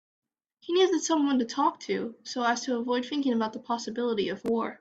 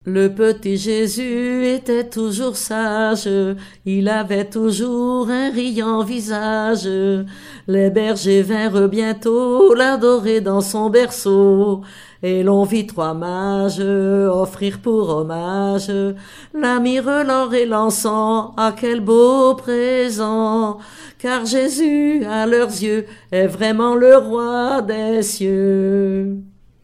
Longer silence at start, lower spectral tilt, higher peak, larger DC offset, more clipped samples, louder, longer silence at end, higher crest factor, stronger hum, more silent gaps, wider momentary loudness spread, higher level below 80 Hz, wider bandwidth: first, 0.65 s vs 0.05 s; second, -3.5 dB/octave vs -5 dB/octave; second, -12 dBFS vs 0 dBFS; second, under 0.1% vs 0.2%; neither; second, -28 LUFS vs -17 LUFS; second, 0.05 s vs 0.35 s; about the same, 16 dB vs 16 dB; neither; neither; about the same, 8 LU vs 9 LU; second, -72 dBFS vs -54 dBFS; second, 9 kHz vs 16 kHz